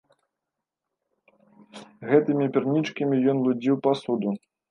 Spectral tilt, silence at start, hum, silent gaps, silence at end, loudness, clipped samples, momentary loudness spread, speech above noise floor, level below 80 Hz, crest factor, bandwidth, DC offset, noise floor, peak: -8 dB/octave; 1.75 s; none; none; 0.35 s; -24 LUFS; under 0.1%; 7 LU; 62 dB; -76 dBFS; 20 dB; 9.6 kHz; under 0.1%; -85 dBFS; -6 dBFS